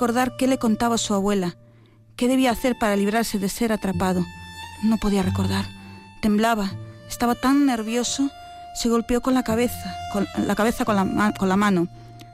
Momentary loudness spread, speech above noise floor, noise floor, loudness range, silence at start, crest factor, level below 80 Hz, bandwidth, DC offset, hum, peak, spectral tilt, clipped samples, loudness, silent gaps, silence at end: 11 LU; 30 dB; -51 dBFS; 2 LU; 0 s; 12 dB; -44 dBFS; 16 kHz; under 0.1%; none; -10 dBFS; -5 dB/octave; under 0.1%; -22 LUFS; none; 0 s